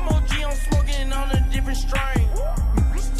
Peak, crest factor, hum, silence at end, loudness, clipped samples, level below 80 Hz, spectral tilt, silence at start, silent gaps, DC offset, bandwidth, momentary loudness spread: -8 dBFS; 10 dB; none; 0 s; -23 LUFS; under 0.1%; -20 dBFS; -5.5 dB/octave; 0 s; none; under 0.1%; 14 kHz; 3 LU